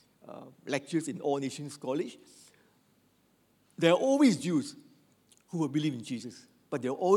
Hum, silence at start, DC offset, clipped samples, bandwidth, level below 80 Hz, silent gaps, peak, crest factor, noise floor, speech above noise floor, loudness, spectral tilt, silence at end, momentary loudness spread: none; 0.25 s; under 0.1%; under 0.1%; 13.5 kHz; -86 dBFS; none; -10 dBFS; 22 dB; -69 dBFS; 39 dB; -31 LUFS; -5.5 dB/octave; 0 s; 22 LU